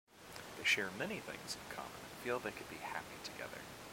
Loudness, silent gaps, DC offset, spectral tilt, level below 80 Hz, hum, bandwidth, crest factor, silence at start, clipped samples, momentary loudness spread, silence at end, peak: -41 LUFS; none; under 0.1%; -2.5 dB/octave; -70 dBFS; none; 16.5 kHz; 22 dB; 0.1 s; under 0.1%; 15 LU; 0 s; -22 dBFS